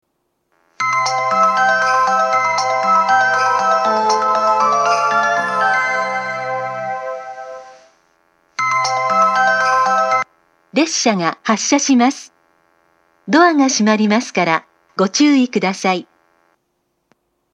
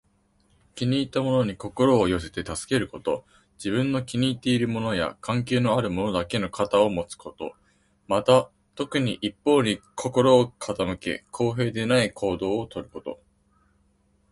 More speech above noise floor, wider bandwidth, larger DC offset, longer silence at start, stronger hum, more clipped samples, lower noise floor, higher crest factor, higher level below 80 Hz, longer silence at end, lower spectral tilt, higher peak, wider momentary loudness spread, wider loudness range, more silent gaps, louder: first, 54 dB vs 41 dB; about the same, 10.5 kHz vs 11.5 kHz; neither; about the same, 0.8 s vs 0.75 s; neither; neither; about the same, -68 dBFS vs -65 dBFS; second, 16 dB vs 22 dB; second, -76 dBFS vs -52 dBFS; first, 1.5 s vs 1.2 s; second, -3.5 dB/octave vs -5.5 dB/octave; first, 0 dBFS vs -4 dBFS; second, 10 LU vs 15 LU; about the same, 5 LU vs 3 LU; neither; first, -15 LUFS vs -25 LUFS